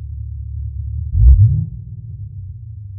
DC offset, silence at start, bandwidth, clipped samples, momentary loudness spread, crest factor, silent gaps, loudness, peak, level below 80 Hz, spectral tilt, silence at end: under 0.1%; 0 s; 0.6 kHz; under 0.1%; 21 LU; 16 dB; none; -16 LUFS; 0 dBFS; -18 dBFS; -17 dB/octave; 0 s